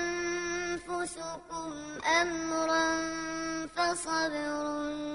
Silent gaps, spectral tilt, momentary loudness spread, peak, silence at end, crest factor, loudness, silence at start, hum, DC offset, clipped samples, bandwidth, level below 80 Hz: none; -2.5 dB/octave; 11 LU; -14 dBFS; 0 s; 18 dB; -32 LUFS; 0 s; none; under 0.1%; under 0.1%; 11 kHz; -60 dBFS